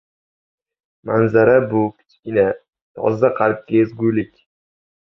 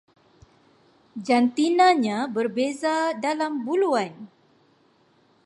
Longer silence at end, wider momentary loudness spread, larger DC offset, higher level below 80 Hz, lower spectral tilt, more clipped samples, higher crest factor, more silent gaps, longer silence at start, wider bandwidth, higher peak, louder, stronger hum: second, 0.9 s vs 1.2 s; first, 15 LU vs 8 LU; neither; first, -56 dBFS vs -74 dBFS; first, -10 dB/octave vs -4.5 dB/octave; neither; about the same, 18 dB vs 18 dB; first, 2.82-2.95 s vs none; about the same, 1.05 s vs 1.15 s; second, 6 kHz vs 11.5 kHz; first, -2 dBFS vs -8 dBFS; first, -17 LUFS vs -23 LUFS; neither